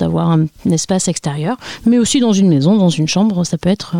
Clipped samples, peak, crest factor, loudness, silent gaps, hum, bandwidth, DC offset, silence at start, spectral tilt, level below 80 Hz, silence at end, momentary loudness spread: under 0.1%; -2 dBFS; 10 dB; -14 LUFS; none; none; 15 kHz; 0.4%; 0 s; -5.5 dB/octave; -46 dBFS; 0 s; 7 LU